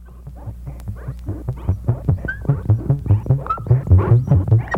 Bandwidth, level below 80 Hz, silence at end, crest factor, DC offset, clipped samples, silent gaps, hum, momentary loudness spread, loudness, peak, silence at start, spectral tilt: 3.2 kHz; -30 dBFS; 0 s; 16 dB; under 0.1%; under 0.1%; none; none; 18 LU; -18 LUFS; -2 dBFS; 0 s; -10 dB/octave